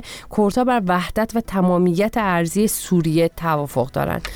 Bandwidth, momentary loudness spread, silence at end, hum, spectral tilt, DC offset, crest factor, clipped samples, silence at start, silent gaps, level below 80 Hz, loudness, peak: 19 kHz; 5 LU; 0 s; none; -6 dB/octave; under 0.1%; 12 dB; under 0.1%; 0 s; none; -40 dBFS; -19 LUFS; -8 dBFS